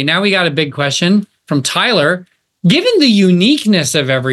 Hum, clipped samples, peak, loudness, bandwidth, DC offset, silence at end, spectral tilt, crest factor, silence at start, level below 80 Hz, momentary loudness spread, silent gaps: none; under 0.1%; 0 dBFS; -12 LUFS; 12.5 kHz; under 0.1%; 0 s; -4.5 dB/octave; 12 dB; 0 s; -62 dBFS; 6 LU; none